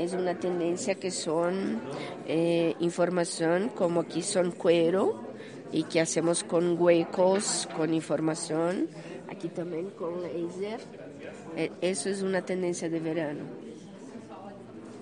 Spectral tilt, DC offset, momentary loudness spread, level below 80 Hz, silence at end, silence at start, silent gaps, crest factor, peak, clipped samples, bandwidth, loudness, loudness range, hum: -4.5 dB/octave; under 0.1%; 18 LU; -76 dBFS; 0 s; 0 s; none; 20 dB; -10 dBFS; under 0.1%; 10.5 kHz; -29 LUFS; 7 LU; none